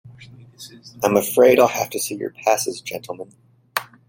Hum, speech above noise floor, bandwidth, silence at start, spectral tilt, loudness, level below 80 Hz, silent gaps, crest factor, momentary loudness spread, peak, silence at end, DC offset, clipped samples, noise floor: none; 25 dB; 17 kHz; 0.05 s; -3.5 dB/octave; -19 LUFS; -62 dBFS; none; 20 dB; 25 LU; -2 dBFS; 0.25 s; under 0.1%; under 0.1%; -44 dBFS